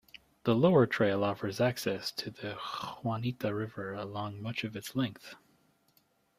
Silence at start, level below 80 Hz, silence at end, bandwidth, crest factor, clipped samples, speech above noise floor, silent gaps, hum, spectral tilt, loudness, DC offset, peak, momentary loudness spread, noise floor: 0.45 s; -68 dBFS; 1 s; 15.5 kHz; 20 dB; under 0.1%; 39 dB; none; none; -6 dB/octave; -32 LUFS; under 0.1%; -14 dBFS; 13 LU; -70 dBFS